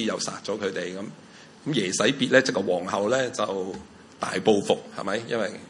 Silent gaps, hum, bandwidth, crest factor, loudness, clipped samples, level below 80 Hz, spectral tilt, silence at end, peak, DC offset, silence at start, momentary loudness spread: none; none; 11.5 kHz; 22 dB; -25 LUFS; under 0.1%; -68 dBFS; -3.5 dB/octave; 0 s; -4 dBFS; under 0.1%; 0 s; 14 LU